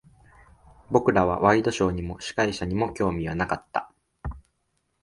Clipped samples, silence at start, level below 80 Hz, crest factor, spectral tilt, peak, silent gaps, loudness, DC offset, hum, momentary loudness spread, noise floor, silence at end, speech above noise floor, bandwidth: under 0.1%; 0.9 s; -44 dBFS; 22 dB; -6 dB/octave; -4 dBFS; none; -25 LUFS; under 0.1%; none; 15 LU; -74 dBFS; 0.6 s; 50 dB; 11.5 kHz